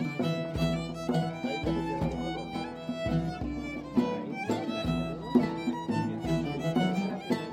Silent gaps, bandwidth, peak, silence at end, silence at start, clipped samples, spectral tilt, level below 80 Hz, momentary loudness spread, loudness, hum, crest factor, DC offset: none; 14.5 kHz; -12 dBFS; 0 s; 0 s; under 0.1%; -7 dB/octave; -48 dBFS; 6 LU; -31 LUFS; none; 18 dB; under 0.1%